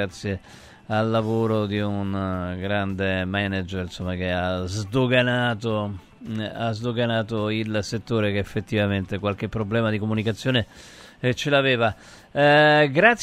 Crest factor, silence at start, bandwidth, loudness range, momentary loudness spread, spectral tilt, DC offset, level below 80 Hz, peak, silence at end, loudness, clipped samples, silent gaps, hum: 22 dB; 0 s; 13 kHz; 4 LU; 12 LU; -6 dB/octave; under 0.1%; -52 dBFS; -2 dBFS; 0 s; -23 LUFS; under 0.1%; none; none